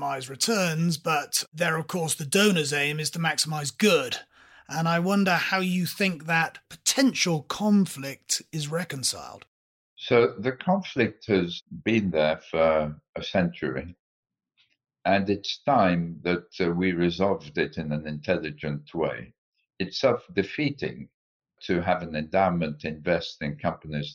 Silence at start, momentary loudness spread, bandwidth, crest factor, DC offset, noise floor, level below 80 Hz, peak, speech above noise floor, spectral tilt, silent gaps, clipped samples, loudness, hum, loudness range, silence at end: 0 s; 10 LU; 16.5 kHz; 18 dB; under 0.1%; -69 dBFS; -58 dBFS; -8 dBFS; 43 dB; -4.5 dB/octave; 1.48-1.52 s, 9.48-9.97 s, 13.09-13.13 s, 13.99-14.23 s, 19.38-19.52 s, 21.14-21.40 s; under 0.1%; -26 LUFS; none; 5 LU; 0 s